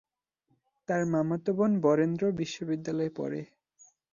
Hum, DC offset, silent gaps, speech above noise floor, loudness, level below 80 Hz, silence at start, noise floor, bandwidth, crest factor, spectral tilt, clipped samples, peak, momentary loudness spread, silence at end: none; under 0.1%; none; 47 dB; -29 LUFS; -70 dBFS; 0.9 s; -76 dBFS; 7.4 kHz; 18 dB; -7 dB/octave; under 0.1%; -12 dBFS; 11 LU; 0.7 s